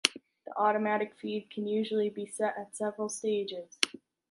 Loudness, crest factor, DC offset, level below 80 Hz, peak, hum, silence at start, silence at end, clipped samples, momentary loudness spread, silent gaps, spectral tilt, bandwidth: -32 LUFS; 32 dB; under 0.1%; -82 dBFS; -2 dBFS; none; 0.05 s; 0.35 s; under 0.1%; 8 LU; none; -3 dB/octave; 11.5 kHz